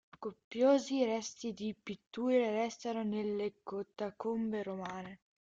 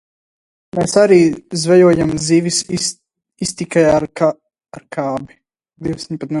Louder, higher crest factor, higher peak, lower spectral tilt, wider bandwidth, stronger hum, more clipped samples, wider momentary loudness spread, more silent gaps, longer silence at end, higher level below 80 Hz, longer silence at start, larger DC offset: second, -36 LUFS vs -15 LUFS; about the same, 18 dB vs 16 dB; second, -18 dBFS vs 0 dBFS; about the same, -5 dB/octave vs -5 dB/octave; second, 7.8 kHz vs 11.5 kHz; neither; neither; about the same, 15 LU vs 15 LU; first, 0.44-0.51 s, 2.07-2.11 s vs none; first, 0.3 s vs 0 s; second, -76 dBFS vs -48 dBFS; second, 0.2 s vs 0.75 s; neither